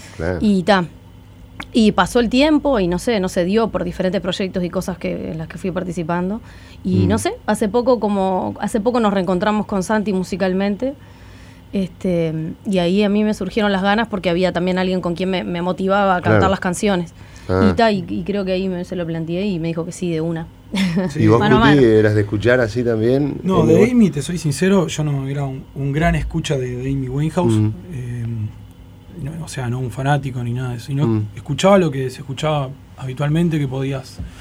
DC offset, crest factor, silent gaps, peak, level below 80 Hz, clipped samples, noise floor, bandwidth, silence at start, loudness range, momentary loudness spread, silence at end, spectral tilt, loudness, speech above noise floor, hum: under 0.1%; 18 dB; none; 0 dBFS; -40 dBFS; under 0.1%; -41 dBFS; over 20 kHz; 0 s; 7 LU; 11 LU; 0 s; -6.5 dB/octave; -18 LUFS; 23 dB; none